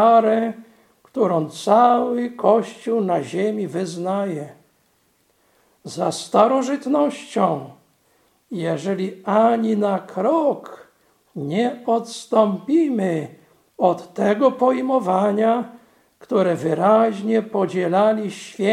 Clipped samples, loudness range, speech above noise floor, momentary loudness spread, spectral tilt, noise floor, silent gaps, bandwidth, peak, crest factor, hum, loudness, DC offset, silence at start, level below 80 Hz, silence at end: under 0.1%; 4 LU; 44 dB; 11 LU; -6.5 dB/octave; -63 dBFS; none; 13 kHz; 0 dBFS; 20 dB; none; -20 LUFS; under 0.1%; 0 s; -74 dBFS; 0 s